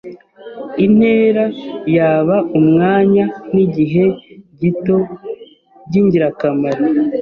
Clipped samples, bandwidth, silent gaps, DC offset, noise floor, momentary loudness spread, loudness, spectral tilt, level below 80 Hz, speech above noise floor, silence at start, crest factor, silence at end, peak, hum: under 0.1%; 6.2 kHz; none; under 0.1%; -41 dBFS; 14 LU; -14 LUFS; -10 dB/octave; -52 dBFS; 28 dB; 0.05 s; 12 dB; 0 s; -2 dBFS; none